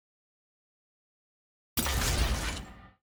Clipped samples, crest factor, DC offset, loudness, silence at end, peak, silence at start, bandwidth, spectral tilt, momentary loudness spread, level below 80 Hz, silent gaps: under 0.1%; 20 dB; under 0.1%; -31 LUFS; 0.15 s; -16 dBFS; 1.75 s; over 20 kHz; -3 dB/octave; 12 LU; -38 dBFS; none